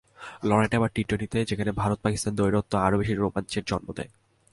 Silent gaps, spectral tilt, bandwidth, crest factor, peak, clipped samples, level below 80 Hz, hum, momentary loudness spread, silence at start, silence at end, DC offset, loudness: none; -6 dB/octave; 11.5 kHz; 20 dB; -8 dBFS; under 0.1%; -46 dBFS; none; 8 LU; 0.2 s; 0.45 s; under 0.1%; -26 LUFS